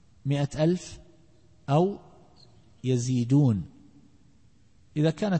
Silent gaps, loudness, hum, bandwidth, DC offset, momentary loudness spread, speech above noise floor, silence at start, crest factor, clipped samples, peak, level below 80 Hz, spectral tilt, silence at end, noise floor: none; -27 LUFS; none; 8.8 kHz; 0.1%; 19 LU; 36 dB; 0.25 s; 16 dB; under 0.1%; -12 dBFS; -56 dBFS; -7.5 dB/octave; 0 s; -61 dBFS